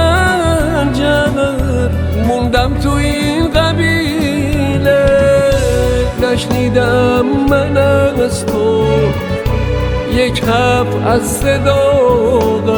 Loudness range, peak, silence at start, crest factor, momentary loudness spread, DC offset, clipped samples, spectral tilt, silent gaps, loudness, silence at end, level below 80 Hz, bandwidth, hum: 2 LU; 0 dBFS; 0 s; 12 dB; 5 LU; under 0.1%; under 0.1%; -6 dB/octave; none; -13 LUFS; 0 s; -24 dBFS; over 20 kHz; none